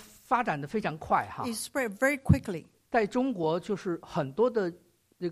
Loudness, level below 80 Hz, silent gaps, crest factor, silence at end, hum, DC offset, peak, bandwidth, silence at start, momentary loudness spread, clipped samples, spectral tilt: -30 LUFS; -50 dBFS; none; 22 dB; 0 s; none; under 0.1%; -8 dBFS; 15 kHz; 0 s; 7 LU; under 0.1%; -6 dB/octave